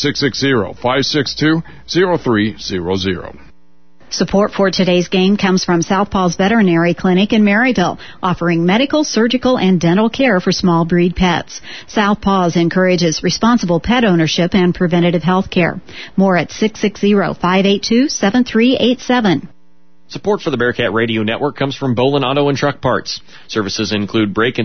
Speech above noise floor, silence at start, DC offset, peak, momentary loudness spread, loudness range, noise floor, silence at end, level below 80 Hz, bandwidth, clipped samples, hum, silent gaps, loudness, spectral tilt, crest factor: 41 dB; 0 s; 1%; 0 dBFS; 7 LU; 3 LU; -55 dBFS; 0 s; -40 dBFS; 6.6 kHz; under 0.1%; none; none; -14 LUFS; -5.5 dB/octave; 14 dB